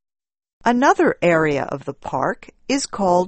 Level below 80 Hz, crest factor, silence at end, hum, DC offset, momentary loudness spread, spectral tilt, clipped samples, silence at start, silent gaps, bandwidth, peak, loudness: -52 dBFS; 18 dB; 0 s; none; under 0.1%; 11 LU; -5 dB/octave; under 0.1%; 0.65 s; none; 8.8 kHz; -2 dBFS; -19 LUFS